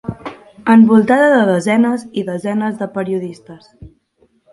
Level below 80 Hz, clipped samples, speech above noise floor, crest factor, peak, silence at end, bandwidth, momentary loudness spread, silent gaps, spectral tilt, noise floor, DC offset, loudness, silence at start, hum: -52 dBFS; under 0.1%; 44 dB; 14 dB; 0 dBFS; 0.65 s; 11.5 kHz; 17 LU; none; -7 dB/octave; -57 dBFS; under 0.1%; -14 LUFS; 0.05 s; none